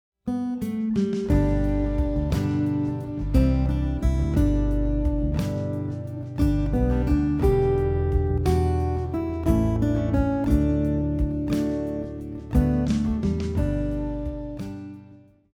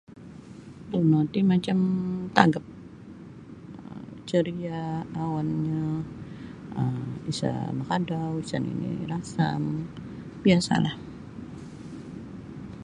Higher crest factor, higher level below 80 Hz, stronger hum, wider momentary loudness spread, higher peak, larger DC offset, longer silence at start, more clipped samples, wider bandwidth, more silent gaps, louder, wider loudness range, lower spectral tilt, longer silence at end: second, 14 dB vs 28 dB; first, -28 dBFS vs -56 dBFS; neither; second, 9 LU vs 22 LU; second, -8 dBFS vs 0 dBFS; neither; first, 0.25 s vs 0.1 s; neither; first, 15.5 kHz vs 11 kHz; neither; about the same, -25 LUFS vs -27 LUFS; second, 2 LU vs 5 LU; first, -9 dB/octave vs -6.5 dB/octave; first, 0.4 s vs 0 s